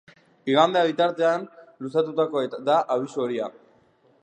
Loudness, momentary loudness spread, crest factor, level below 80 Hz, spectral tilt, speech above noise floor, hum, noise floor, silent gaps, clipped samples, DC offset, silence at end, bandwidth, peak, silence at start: -23 LUFS; 14 LU; 20 dB; -80 dBFS; -5.5 dB/octave; 37 dB; none; -60 dBFS; none; under 0.1%; under 0.1%; 0.7 s; 9.4 kHz; -4 dBFS; 0.45 s